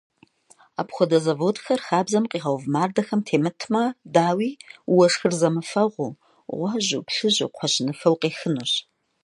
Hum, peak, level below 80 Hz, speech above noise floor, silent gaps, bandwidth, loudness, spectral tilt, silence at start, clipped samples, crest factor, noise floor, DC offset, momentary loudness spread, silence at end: none; -4 dBFS; -74 dBFS; 35 dB; none; 11.5 kHz; -23 LUFS; -4.5 dB/octave; 0.8 s; under 0.1%; 20 dB; -57 dBFS; under 0.1%; 9 LU; 0.45 s